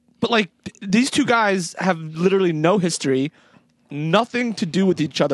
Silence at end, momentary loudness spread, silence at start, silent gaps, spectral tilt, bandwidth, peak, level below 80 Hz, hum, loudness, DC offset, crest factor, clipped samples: 0 s; 8 LU; 0.2 s; none; -5 dB/octave; 12 kHz; -2 dBFS; -62 dBFS; none; -20 LUFS; under 0.1%; 18 dB; under 0.1%